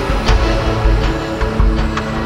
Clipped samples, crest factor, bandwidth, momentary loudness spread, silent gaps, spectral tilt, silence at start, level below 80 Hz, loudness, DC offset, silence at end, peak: under 0.1%; 14 dB; 10 kHz; 4 LU; none; -6 dB/octave; 0 s; -16 dBFS; -16 LUFS; under 0.1%; 0 s; 0 dBFS